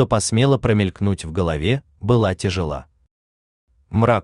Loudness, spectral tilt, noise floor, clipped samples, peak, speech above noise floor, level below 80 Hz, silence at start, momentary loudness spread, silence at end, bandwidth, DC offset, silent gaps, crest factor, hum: -20 LUFS; -6 dB/octave; under -90 dBFS; under 0.1%; -4 dBFS; over 71 dB; -40 dBFS; 0 s; 8 LU; 0 s; 11 kHz; under 0.1%; 3.11-3.67 s; 16 dB; none